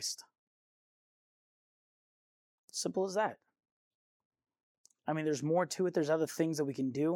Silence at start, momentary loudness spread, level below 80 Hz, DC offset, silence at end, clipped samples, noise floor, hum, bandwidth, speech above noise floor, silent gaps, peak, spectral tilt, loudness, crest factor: 0 s; 7 LU; -88 dBFS; under 0.1%; 0 s; under 0.1%; under -90 dBFS; none; 16.5 kHz; over 57 dB; 0.38-2.68 s, 3.71-4.30 s, 4.63-4.84 s; -18 dBFS; -5 dB/octave; -34 LUFS; 18 dB